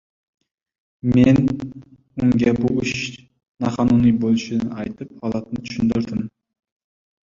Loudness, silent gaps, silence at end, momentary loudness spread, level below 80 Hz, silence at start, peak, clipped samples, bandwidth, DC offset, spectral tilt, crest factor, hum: -20 LUFS; 3.48-3.55 s; 1.1 s; 14 LU; -46 dBFS; 1.05 s; -2 dBFS; under 0.1%; 7.4 kHz; under 0.1%; -7 dB/octave; 18 dB; none